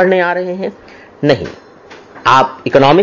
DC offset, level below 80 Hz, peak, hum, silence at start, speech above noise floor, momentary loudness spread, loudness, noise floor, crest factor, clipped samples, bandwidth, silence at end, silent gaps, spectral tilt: under 0.1%; -46 dBFS; 0 dBFS; none; 0 s; 26 dB; 12 LU; -13 LUFS; -38 dBFS; 14 dB; 0.1%; 7.4 kHz; 0 s; none; -6 dB/octave